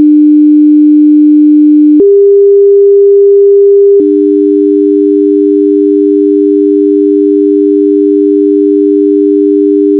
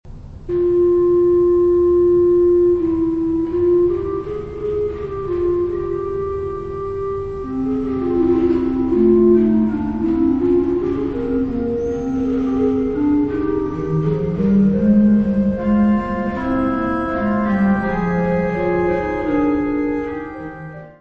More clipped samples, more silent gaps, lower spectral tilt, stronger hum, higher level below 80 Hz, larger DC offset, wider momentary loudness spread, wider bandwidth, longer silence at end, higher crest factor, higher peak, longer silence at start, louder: first, 3% vs under 0.1%; neither; first, -12 dB/octave vs -10 dB/octave; neither; second, -64 dBFS vs -36 dBFS; first, 0.4% vs under 0.1%; second, 3 LU vs 10 LU; second, 1.5 kHz vs 4.5 kHz; about the same, 0 s vs 0.1 s; second, 4 dB vs 14 dB; first, 0 dBFS vs -4 dBFS; about the same, 0 s vs 0.05 s; first, -5 LUFS vs -18 LUFS